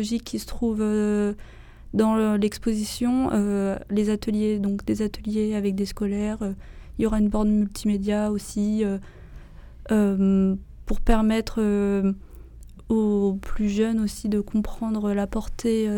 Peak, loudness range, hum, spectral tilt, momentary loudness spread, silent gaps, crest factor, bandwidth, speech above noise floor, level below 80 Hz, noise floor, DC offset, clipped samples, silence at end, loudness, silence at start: -8 dBFS; 2 LU; none; -6.5 dB/octave; 7 LU; none; 16 dB; 17 kHz; 20 dB; -36 dBFS; -43 dBFS; under 0.1%; under 0.1%; 0 s; -24 LUFS; 0 s